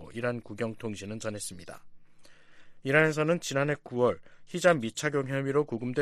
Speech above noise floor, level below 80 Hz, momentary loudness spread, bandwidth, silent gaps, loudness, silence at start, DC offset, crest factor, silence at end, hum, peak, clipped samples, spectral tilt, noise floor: 22 dB; -64 dBFS; 15 LU; 13.5 kHz; none; -29 LUFS; 0 s; under 0.1%; 22 dB; 0 s; none; -8 dBFS; under 0.1%; -5 dB/octave; -51 dBFS